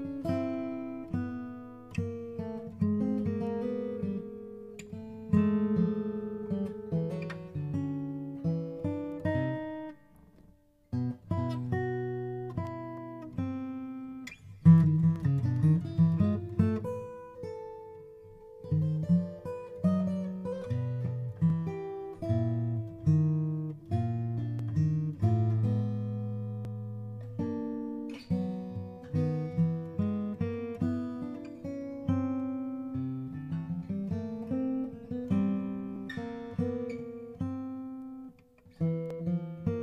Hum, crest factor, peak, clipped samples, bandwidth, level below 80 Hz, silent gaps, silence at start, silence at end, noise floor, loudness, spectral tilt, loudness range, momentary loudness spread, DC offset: none; 22 dB; -10 dBFS; under 0.1%; 7.4 kHz; -60 dBFS; none; 0 s; 0 s; -61 dBFS; -32 LUFS; -10 dB/octave; 8 LU; 14 LU; under 0.1%